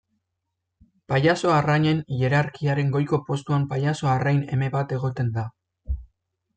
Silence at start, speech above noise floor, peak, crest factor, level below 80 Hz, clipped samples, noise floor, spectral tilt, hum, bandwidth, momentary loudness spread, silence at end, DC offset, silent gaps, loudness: 1.1 s; 58 dB; -8 dBFS; 16 dB; -44 dBFS; under 0.1%; -80 dBFS; -7 dB/octave; none; 8.8 kHz; 11 LU; 0.5 s; under 0.1%; none; -23 LUFS